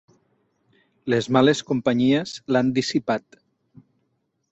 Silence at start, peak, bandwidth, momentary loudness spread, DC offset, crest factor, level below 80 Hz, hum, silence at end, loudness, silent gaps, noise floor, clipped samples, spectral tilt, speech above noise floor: 1.05 s; -4 dBFS; 8.2 kHz; 8 LU; under 0.1%; 20 dB; -62 dBFS; none; 1.3 s; -22 LUFS; none; -72 dBFS; under 0.1%; -5.5 dB/octave; 51 dB